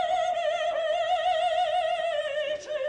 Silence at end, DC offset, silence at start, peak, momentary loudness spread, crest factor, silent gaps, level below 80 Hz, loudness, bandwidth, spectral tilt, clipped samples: 0 s; under 0.1%; 0 s; -18 dBFS; 4 LU; 10 dB; none; -64 dBFS; -27 LUFS; 9.6 kHz; -1 dB/octave; under 0.1%